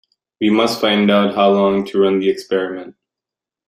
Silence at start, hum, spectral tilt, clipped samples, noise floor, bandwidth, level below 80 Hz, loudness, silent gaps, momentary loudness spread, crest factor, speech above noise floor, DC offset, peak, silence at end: 0.4 s; none; -6 dB/octave; under 0.1%; -87 dBFS; 15 kHz; -60 dBFS; -16 LUFS; none; 7 LU; 14 dB; 72 dB; under 0.1%; -2 dBFS; 0.75 s